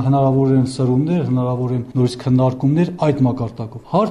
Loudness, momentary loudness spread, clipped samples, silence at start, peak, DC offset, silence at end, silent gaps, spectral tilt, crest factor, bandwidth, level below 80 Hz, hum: -18 LUFS; 6 LU; under 0.1%; 0 s; -2 dBFS; under 0.1%; 0 s; none; -8.5 dB/octave; 14 dB; 10.5 kHz; -48 dBFS; none